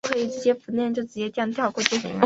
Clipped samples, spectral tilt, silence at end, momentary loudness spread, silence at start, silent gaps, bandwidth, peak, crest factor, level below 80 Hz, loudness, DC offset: under 0.1%; -3.5 dB/octave; 0 s; 4 LU; 0.05 s; none; 8 kHz; 0 dBFS; 24 dB; -66 dBFS; -25 LUFS; under 0.1%